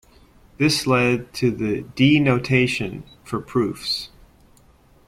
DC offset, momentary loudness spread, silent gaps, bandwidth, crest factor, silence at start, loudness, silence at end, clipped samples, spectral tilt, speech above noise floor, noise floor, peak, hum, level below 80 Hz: under 0.1%; 13 LU; none; 15.5 kHz; 18 dB; 0.6 s; -21 LUFS; 1 s; under 0.1%; -5.5 dB/octave; 33 dB; -53 dBFS; -4 dBFS; none; -50 dBFS